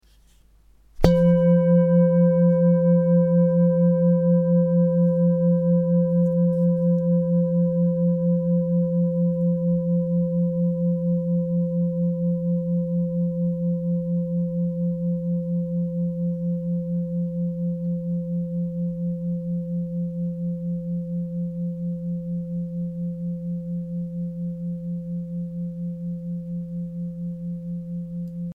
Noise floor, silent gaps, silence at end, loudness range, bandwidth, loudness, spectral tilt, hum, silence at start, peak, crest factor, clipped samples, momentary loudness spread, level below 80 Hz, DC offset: -55 dBFS; none; 0 s; 12 LU; 4.8 kHz; -23 LUFS; -11 dB/octave; none; 0.95 s; 0 dBFS; 22 dB; under 0.1%; 13 LU; -46 dBFS; under 0.1%